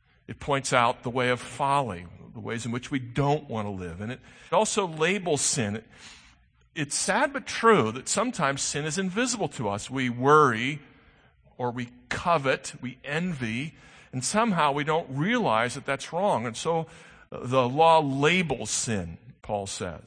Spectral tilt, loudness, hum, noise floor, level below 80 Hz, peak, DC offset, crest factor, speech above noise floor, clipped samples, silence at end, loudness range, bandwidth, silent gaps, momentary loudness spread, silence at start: -4 dB/octave; -26 LUFS; none; -59 dBFS; -58 dBFS; -4 dBFS; under 0.1%; 22 dB; 33 dB; under 0.1%; 0.1 s; 4 LU; 9.8 kHz; none; 16 LU; 0.3 s